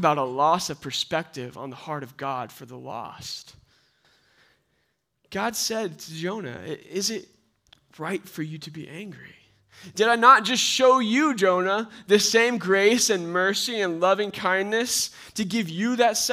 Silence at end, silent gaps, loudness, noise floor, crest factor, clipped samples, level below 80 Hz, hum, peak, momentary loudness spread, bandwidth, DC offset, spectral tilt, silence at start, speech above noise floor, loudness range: 0 s; none; -22 LUFS; -73 dBFS; 22 dB; under 0.1%; -68 dBFS; none; -2 dBFS; 18 LU; 16 kHz; under 0.1%; -3 dB/octave; 0 s; 49 dB; 16 LU